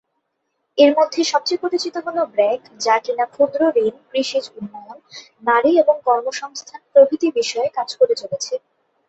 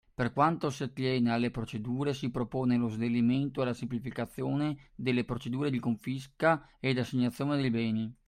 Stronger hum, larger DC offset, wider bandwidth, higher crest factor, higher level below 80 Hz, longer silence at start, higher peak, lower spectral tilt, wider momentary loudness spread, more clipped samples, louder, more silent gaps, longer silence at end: neither; neither; second, 8.2 kHz vs 13 kHz; about the same, 18 dB vs 18 dB; second, -68 dBFS vs -58 dBFS; first, 0.75 s vs 0.2 s; first, -2 dBFS vs -12 dBFS; second, -3 dB/octave vs -7 dB/octave; first, 16 LU vs 7 LU; neither; first, -18 LUFS vs -31 LUFS; neither; first, 0.5 s vs 0.15 s